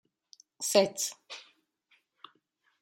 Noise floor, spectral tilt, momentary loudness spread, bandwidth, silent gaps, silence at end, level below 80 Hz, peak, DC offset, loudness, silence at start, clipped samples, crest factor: -74 dBFS; -2 dB/octave; 21 LU; 16.5 kHz; none; 1.4 s; -84 dBFS; -8 dBFS; under 0.1%; -29 LUFS; 0.6 s; under 0.1%; 26 dB